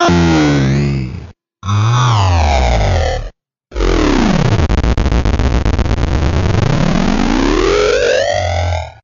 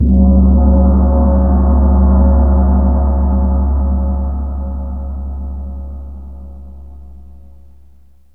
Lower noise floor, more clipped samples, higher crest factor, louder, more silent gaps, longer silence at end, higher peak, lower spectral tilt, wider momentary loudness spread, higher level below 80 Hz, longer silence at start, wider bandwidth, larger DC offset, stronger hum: second, -34 dBFS vs -47 dBFS; neither; about the same, 10 dB vs 12 dB; about the same, -13 LUFS vs -13 LUFS; neither; second, 0.15 s vs 1.15 s; about the same, -2 dBFS vs 0 dBFS; second, -6 dB/octave vs -14 dB/octave; second, 8 LU vs 19 LU; about the same, -18 dBFS vs -14 dBFS; about the same, 0 s vs 0 s; first, 7.6 kHz vs 1.7 kHz; second, under 0.1% vs 2%; neither